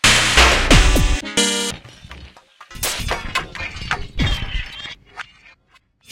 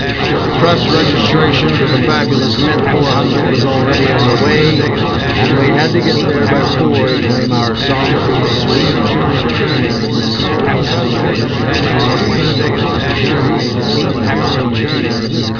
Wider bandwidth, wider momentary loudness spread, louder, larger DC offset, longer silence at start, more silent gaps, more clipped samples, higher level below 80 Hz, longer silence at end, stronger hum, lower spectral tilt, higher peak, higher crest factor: first, 17 kHz vs 5.4 kHz; first, 23 LU vs 4 LU; second, -17 LUFS vs -12 LUFS; second, under 0.1% vs 0.4%; about the same, 0.05 s vs 0 s; neither; neither; first, -24 dBFS vs -32 dBFS; first, 0.9 s vs 0 s; neither; second, -2.5 dB/octave vs -6.5 dB/octave; about the same, 0 dBFS vs 0 dBFS; first, 18 dB vs 12 dB